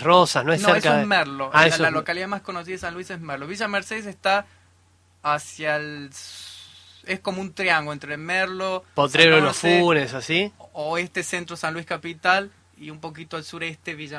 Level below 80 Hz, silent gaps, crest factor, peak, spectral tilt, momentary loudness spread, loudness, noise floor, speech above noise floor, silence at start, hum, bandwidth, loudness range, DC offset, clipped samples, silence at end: -62 dBFS; none; 22 dB; 0 dBFS; -4 dB/octave; 18 LU; -22 LUFS; -59 dBFS; 36 dB; 0 s; none; 11 kHz; 8 LU; under 0.1%; under 0.1%; 0 s